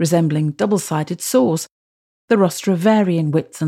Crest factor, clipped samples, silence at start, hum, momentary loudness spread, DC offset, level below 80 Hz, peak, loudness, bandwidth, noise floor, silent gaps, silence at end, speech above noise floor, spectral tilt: 14 dB; under 0.1%; 0 s; none; 7 LU; under 0.1%; -68 dBFS; -2 dBFS; -18 LUFS; 16 kHz; under -90 dBFS; 1.71-2.28 s; 0 s; over 73 dB; -6 dB/octave